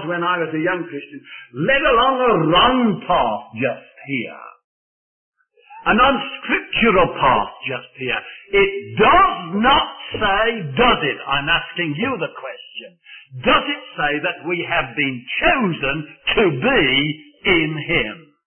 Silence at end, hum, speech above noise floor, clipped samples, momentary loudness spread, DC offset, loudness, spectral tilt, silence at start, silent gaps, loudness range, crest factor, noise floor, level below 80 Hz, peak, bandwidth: 0.3 s; none; 26 dB; under 0.1%; 12 LU; under 0.1%; -18 LUFS; -10 dB/octave; 0 s; 4.64-5.32 s; 5 LU; 16 dB; -44 dBFS; -40 dBFS; -2 dBFS; 3.4 kHz